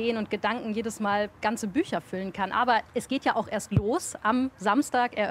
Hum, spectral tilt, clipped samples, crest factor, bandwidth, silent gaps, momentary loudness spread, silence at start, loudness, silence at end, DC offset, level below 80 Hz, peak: none; -5 dB/octave; under 0.1%; 18 dB; 16 kHz; none; 6 LU; 0 s; -28 LUFS; 0 s; under 0.1%; -54 dBFS; -10 dBFS